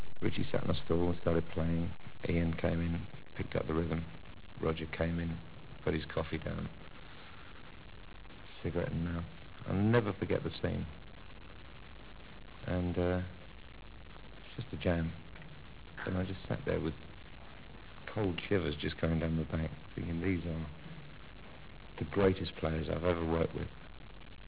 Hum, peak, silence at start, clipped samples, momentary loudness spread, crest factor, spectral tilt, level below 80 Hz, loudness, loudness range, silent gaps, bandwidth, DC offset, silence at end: none; -14 dBFS; 0 s; under 0.1%; 20 LU; 22 dB; -6 dB/octave; -48 dBFS; -36 LUFS; 5 LU; none; 4 kHz; 0.3%; 0 s